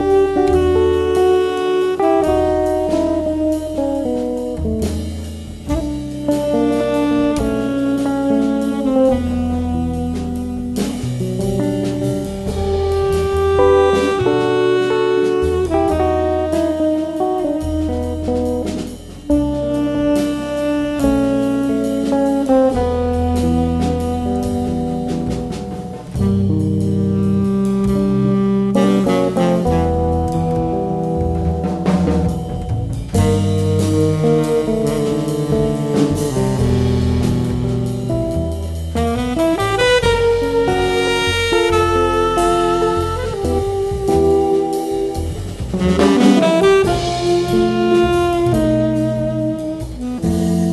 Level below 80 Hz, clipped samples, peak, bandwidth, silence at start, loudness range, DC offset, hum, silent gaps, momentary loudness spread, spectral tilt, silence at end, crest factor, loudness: -30 dBFS; under 0.1%; 0 dBFS; 12.5 kHz; 0 s; 4 LU; under 0.1%; none; none; 7 LU; -6.5 dB/octave; 0 s; 16 dB; -17 LUFS